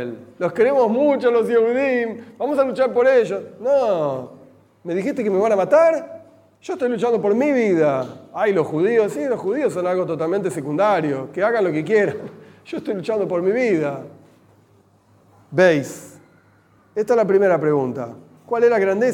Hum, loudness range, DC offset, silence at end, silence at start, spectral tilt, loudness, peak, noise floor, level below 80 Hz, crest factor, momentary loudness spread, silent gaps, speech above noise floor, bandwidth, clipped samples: none; 4 LU; under 0.1%; 0 s; 0 s; -6.5 dB/octave; -19 LUFS; -2 dBFS; -55 dBFS; -72 dBFS; 18 dB; 14 LU; none; 37 dB; 15 kHz; under 0.1%